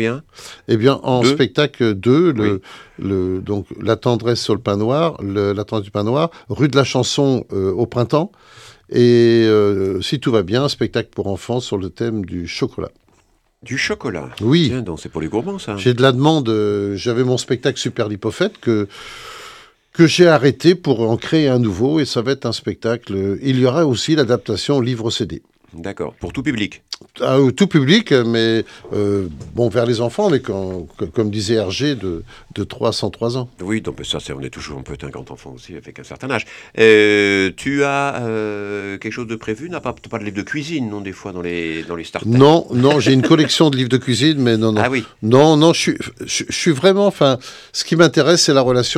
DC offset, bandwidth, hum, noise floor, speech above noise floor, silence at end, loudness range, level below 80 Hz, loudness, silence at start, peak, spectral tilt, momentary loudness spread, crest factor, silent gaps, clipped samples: under 0.1%; 13 kHz; none; -58 dBFS; 41 dB; 0 s; 8 LU; -48 dBFS; -17 LUFS; 0 s; 0 dBFS; -5.5 dB/octave; 15 LU; 16 dB; none; under 0.1%